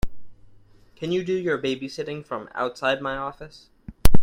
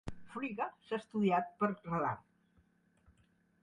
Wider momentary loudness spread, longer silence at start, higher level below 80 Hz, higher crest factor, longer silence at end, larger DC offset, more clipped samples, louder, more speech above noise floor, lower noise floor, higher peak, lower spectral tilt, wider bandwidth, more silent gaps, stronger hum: first, 17 LU vs 10 LU; about the same, 0.05 s vs 0.05 s; first, -32 dBFS vs -64 dBFS; about the same, 20 dB vs 20 dB; second, 0 s vs 1.45 s; neither; neither; first, -27 LUFS vs -37 LUFS; second, 24 dB vs 36 dB; second, -52 dBFS vs -72 dBFS; first, 0 dBFS vs -20 dBFS; second, -5.5 dB/octave vs -8 dB/octave; first, 16.5 kHz vs 10 kHz; neither; neither